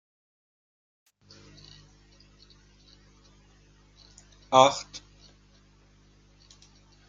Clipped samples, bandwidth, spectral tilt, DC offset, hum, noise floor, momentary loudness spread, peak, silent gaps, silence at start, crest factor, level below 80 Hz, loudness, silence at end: under 0.1%; 9.4 kHz; -3 dB/octave; under 0.1%; 50 Hz at -60 dBFS; -59 dBFS; 30 LU; -2 dBFS; none; 4.5 s; 30 dB; -62 dBFS; -22 LUFS; 2.1 s